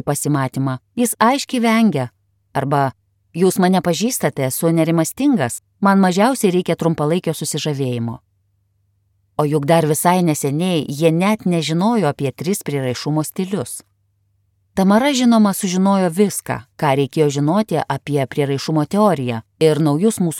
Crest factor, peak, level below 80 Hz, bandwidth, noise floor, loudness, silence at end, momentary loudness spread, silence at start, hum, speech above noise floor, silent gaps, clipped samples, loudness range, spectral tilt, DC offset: 16 dB; 0 dBFS; -58 dBFS; 17.5 kHz; -63 dBFS; -17 LUFS; 0 s; 9 LU; 0.05 s; none; 47 dB; none; under 0.1%; 4 LU; -5.5 dB/octave; under 0.1%